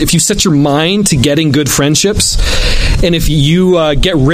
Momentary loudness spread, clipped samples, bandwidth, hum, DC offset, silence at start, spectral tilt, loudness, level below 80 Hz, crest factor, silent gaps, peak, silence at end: 3 LU; under 0.1%; 15.5 kHz; none; under 0.1%; 0 s; -4 dB/octave; -10 LUFS; -16 dBFS; 10 dB; none; 0 dBFS; 0 s